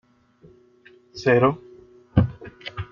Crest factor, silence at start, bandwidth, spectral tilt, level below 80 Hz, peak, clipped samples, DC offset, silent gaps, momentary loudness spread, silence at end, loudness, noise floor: 20 dB; 1.15 s; 7.2 kHz; -8 dB/octave; -44 dBFS; -4 dBFS; under 0.1%; under 0.1%; none; 19 LU; 0.05 s; -22 LUFS; -54 dBFS